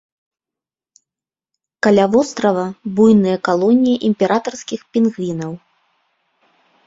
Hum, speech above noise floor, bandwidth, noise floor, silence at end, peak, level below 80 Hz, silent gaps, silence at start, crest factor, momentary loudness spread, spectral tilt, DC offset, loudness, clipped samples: none; 74 dB; 7.8 kHz; -89 dBFS; 1.3 s; -2 dBFS; -58 dBFS; none; 1.85 s; 16 dB; 13 LU; -6.5 dB/octave; under 0.1%; -16 LUFS; under 0.1%